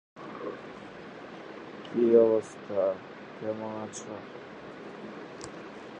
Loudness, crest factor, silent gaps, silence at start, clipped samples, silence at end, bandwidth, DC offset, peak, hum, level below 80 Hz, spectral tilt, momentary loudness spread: -29 LUFS; 22 dB; none; 0.15 s; under 0.1%; 0 s; 9.8 kHz; under 0.1%; -10 dBFS; none; -72 dBFS; -6 dB/octave; 22 LU